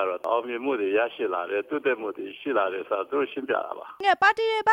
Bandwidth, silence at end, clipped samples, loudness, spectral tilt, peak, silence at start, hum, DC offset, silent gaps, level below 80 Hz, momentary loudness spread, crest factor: 10 kHz; 0 s; under 0.1%; -26 LUFS; -4 dB/octave; -8 dBFS; 0 s; none; under 0.1%; none; -74 dBFS; 9 LU; 18 dB